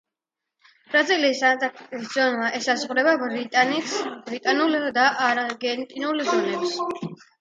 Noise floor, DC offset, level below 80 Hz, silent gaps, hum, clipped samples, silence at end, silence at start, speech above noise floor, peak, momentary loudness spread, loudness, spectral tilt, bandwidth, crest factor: -86 dBFS; under 0.1%; -76 dBFS; none; none; under 0.1%; 0.25 s; 0.9 s; 63 dB; -4 dBFS; 9 LU; -22 LUFS; -3 dB/octave; 9.4 kHz; 18 dB